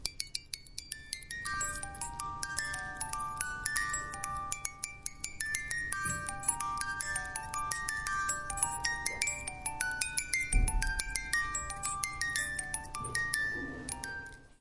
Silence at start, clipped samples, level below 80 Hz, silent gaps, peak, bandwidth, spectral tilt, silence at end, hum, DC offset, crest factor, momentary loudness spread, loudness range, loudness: 0 s; under 0.1%; -44 dBFS; none; -10 dBFS; 11.5 kHz; -1 dB/octave; 0.1 s; none; under 0.1%; 26 dB; 8 LU; 3 LU; -35 LUFS